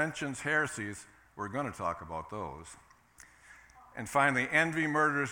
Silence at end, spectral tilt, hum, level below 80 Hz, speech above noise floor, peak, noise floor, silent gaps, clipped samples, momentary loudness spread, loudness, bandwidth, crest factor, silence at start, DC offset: 0 s; -4.5 dB/octave; none; -64 dBFS; 27 dB; -12 dBFS; -59 dBFS; none; under 0.1%; 20 LU; -31 LUFS; 18 kHz; 20 dB; 0 s; under 0.1%